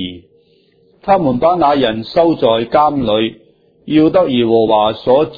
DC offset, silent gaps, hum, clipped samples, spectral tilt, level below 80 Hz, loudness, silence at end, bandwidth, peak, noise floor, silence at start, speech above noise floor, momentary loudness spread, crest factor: under 0.1%; none; none; under 0.1%; -8.5 dB/octave; -46 dBFS; -13 LUFS; 0 s; 5 kHz; 0 dBFS; -52 dBFS; 0 s; 40 dB; 5 LU; 14 dB